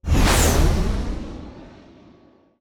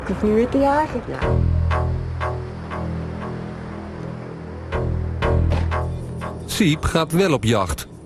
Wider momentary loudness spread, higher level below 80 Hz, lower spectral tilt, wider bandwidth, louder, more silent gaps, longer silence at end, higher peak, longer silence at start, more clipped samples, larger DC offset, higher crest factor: first, 20 LU vs 14 LU; first, -24 dBFS vs -30 dBFS; second, -4.5 dB/octave vs -6 dB/octave; first, over 20 kHz vs 13.5 kHz; about the same, -20 LUFS vs -22 LUFS; neither; first, 0.9 s vs 0 s; about the same, -6 dBFS vs -4 dBFS; about the same, 0.05 s vs 0 s; neither; neither; about the same, 16 dB vs 16 dB